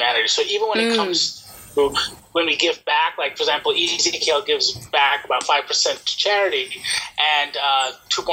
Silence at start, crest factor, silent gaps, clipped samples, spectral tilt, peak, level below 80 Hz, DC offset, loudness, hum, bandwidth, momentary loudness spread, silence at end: 0 s; 18 dB; none; under 0.1%; -0.5 dB/octave; -2 dBFS; -58 dBFS; under 0.1%; -19 LUFS; none; 16 kHz; 5 LU; 0 s